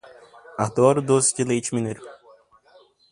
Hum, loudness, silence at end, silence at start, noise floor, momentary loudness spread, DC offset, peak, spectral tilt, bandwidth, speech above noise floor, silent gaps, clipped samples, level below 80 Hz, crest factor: none; -21 LUFS; 1 s; 0.5 s; -55 dBFS; 15 LU; under 0.1%; -2 dBFS; -5 dB/octave; 11.5 kHz; 35 dB; none; under 0.1%; -62 dBFS; 20 dB